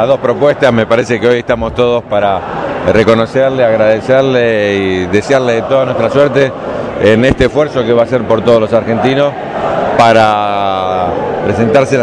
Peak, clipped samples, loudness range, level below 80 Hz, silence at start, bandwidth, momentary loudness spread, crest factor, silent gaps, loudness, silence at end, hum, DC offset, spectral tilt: 0 dBFS; 1%; 1 LU; -36 dBFS; 0 s; 11 kHz; 6 LU; 10 dB; none; -11 LUFS; 0 s; none; under 0.1%; -6.5 dB/octave